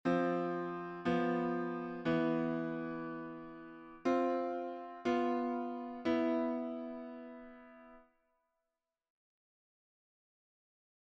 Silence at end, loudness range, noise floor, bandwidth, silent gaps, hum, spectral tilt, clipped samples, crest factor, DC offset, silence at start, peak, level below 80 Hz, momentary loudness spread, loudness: 3.05 s; 9 LU; -90 dBFS; 7.4 kHz; none; none; -7.5 dB/octave; under 0.1%; 18 dB; under 0.1%; 0.05 s; -20 dBFS; -74 dBFS; 17 LU; -37 LUFS